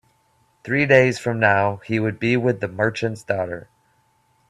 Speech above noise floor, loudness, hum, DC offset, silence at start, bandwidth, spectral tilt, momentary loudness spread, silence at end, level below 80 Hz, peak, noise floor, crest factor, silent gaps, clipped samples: 43 dB; -20 LUFS; none; under 0.1%; 0.65 s; 12.5 kHz; -6.5 dB/octave; 11 LU; 0.9 s; -58 dBFS; 0 dBFS; -63 dBFS; 22 dB; none; under 0.1%